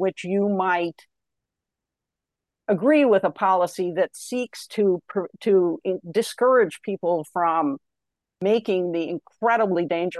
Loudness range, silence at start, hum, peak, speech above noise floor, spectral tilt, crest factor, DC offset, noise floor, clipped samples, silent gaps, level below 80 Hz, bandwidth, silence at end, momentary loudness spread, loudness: 2 LU; 0 s; none; -8 dBFS; 64 dB; -6 dB/octave; 16 dB; under 0.1%; -86 dBFS; under 0.1%; none; -76 dBFS; 12.5 kHz; 0 s; 10 LU; -23 LUFS